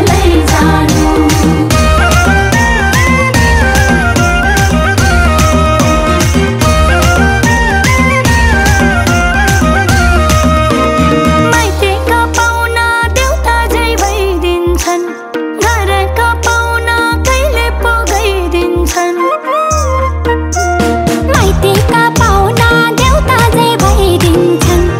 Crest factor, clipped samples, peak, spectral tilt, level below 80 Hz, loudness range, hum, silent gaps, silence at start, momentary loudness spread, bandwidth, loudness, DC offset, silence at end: 8 dB; 0.4%; 0 dBFS; -5 dB/octave; -16 dBFS; 3 LU; none; none; 0 s; 4 LU; 16.5 kHz; -9 LUFS; under 0.1%; 0 s